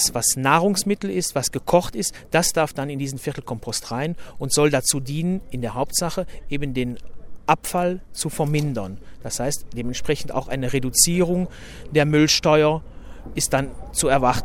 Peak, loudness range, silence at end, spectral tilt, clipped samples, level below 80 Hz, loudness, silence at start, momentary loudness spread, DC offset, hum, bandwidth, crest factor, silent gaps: -2 dBFS; 6 LU; 0 s; -4 dB/octave; under 0.1%; -40 dBFS; -22 LUFS; 0 s; 13 LU; under 0.1%; none; 17 kHz; 20 dB; none